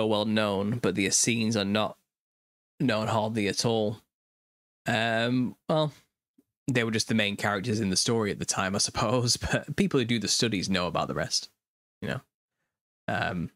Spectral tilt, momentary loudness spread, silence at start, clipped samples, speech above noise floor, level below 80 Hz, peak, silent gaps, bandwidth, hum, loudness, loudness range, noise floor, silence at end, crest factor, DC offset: -4 dB/octave; 9 LU; 0 s; under 0.1%; 43 dB; -56 dBFS; -8 dBFS; 2.19-2.78 s, 4.14-4.85 s, 6.28-6.34 s, 6.57-6.66 s, 11.67-12.01 s, 12.34-12.49 s, 12.81-13.07 s; 16 kHz; none; -27 LUFS; 4 LU; -70 dBFS; 0.05 s; 20 dB; under 0.1%